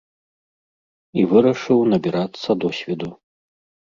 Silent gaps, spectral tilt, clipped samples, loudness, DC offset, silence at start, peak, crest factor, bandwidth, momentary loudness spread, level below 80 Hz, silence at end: none; -7.5 dB/octave; under 0.1%; -19 LUFS; under 0.1%; 1.15 s; -2 dBFS; 18 dB; 7.4 kHz; 12 LU; -60 dBFS; 0.75 s